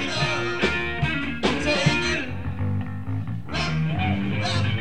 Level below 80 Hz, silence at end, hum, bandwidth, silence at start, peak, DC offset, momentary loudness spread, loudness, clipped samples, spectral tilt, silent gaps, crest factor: -42 dBFS; 0 s; none; 10.5 kHz; 0 s; -8 dBFS; 2%; 9 LU; -24 LUFS; under 0.1%; -5 dB/octave; none; 18 dB